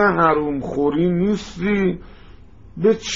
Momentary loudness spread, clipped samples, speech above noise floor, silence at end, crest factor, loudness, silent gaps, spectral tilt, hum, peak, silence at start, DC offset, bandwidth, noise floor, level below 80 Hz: 7 LU; under 0.1%; 25 dB; 0 s; 16 dB; -19 LUFS; none; -5.5 dB/octave; none; -4 dBFS; 0 s; 0.5%; 7.6 kHz; -44 dBFS; -42 dBFS